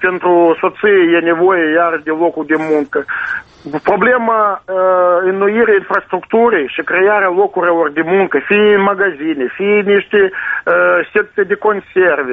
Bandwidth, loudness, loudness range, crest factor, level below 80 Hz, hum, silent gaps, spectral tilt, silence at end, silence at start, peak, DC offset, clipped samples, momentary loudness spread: 4.8 kHz; -12 LUFS; 2 LU; 12 dB; -54 dBFS; none; none; -7.5 dB/octave; 0 s; 0 s; 0 dBFS; under 0.1%; under 0.1%; 6 LU